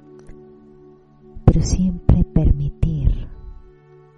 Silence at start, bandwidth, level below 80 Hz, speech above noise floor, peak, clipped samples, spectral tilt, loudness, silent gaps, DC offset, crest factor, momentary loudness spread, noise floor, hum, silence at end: 0.3 s; 9.6 kHz; -24 dBFS; 31 dB; -2 dBFS; under 0.1%; -8 dB/octave; -19 LUFS; none; under 0.1%; 18 dB; 7 LU; -47 dBFS; none; 0.65 s